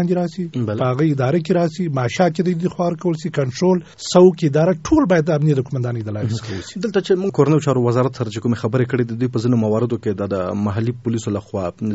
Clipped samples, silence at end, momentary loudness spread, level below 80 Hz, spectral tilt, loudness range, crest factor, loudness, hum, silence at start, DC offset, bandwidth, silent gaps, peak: under 0.1%; 0 s; 8 LU; -50 dBFS; -7 dB/octave; 3 LU; 18 dB; -19 LUFS; none; 0 s; 0.1%; 8 kHz; none; 0 dBFS